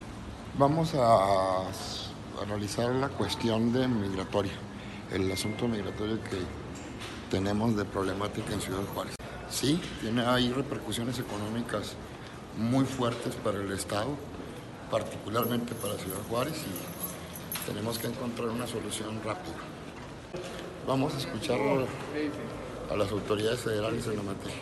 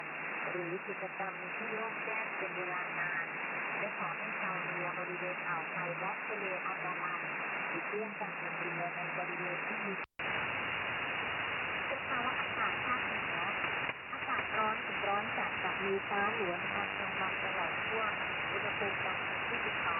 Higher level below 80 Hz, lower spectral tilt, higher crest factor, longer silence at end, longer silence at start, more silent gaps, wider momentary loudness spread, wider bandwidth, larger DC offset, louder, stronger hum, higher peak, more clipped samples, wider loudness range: first, -52 dBFS vs -70 dBFS; second, -5 dB/octave vs -7 dB/octave; about the same, 20 dB vs 16 dB; about the same, 0 s vs 0 s; about the same, 0 s vs 0 s; neither; first, 13 LU vs 4 LU; first, 12.5 kHz vs 4.5 kHz; neither; first, -32 LUFS vs -35 LUFS; neither; first, -10 dBFS vs -20 dBFS; neither; first, 6 LU vs 3 LU